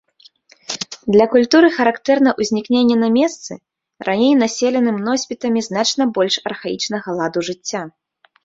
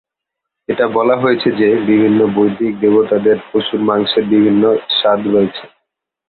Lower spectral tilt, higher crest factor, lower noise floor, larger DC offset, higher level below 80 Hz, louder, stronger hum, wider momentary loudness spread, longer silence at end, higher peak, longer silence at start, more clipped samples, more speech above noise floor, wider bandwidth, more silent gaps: second, -4 dB/octave vs -10 dB/octave; about the same, 16 dB vs 12 dB; second, -50 dBFS vs -80 dBFS; neither; second, -60 dBFS vs -54 dBFS; second, -17 LUFS vs -13 LUFS; neither; first, 13 LU vs 5 LU; about the same, 0.55 s vs 0.65 s; about the same, 0 dBFS vs -2 dBFS; about the same, 0.7 s vs 0.7 s; neither; second, 34 dB vs 67 dB; first, 8 kHz vs 4.5 kHz; neither